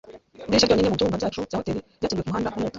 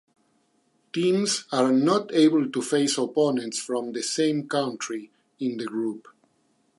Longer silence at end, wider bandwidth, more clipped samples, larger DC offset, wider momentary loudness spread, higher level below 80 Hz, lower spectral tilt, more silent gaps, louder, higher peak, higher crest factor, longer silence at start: second, 0 s vs 0.8 s; second, 7.8 kHz vs 11.5 kHz; neither; neither; about the same, 10 LU vs 12 LU; first, -46 dBFS vs -80 dBFS; about the same, -5 dB/octave vs -4 dB/octave; neither; about the same, -24 LUFS vs -25 LUFS; about the same, -6 dBFS vs -8 dBFS; about the same, 18 dB vs 18 dB; second, 0.05 s vs 0.95 s